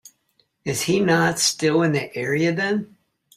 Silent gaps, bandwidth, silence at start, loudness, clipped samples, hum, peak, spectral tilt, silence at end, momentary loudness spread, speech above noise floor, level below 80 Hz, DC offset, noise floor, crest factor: none; 15.5 kHz; 0.65 s; -21 LUFS; under 0.1%; none; -6 dBFS; -4 dB/octave; 0.5 s; 9 LU; 46 dB; -60 dBFS; under 0.1%; -67 dBFS; 16 dB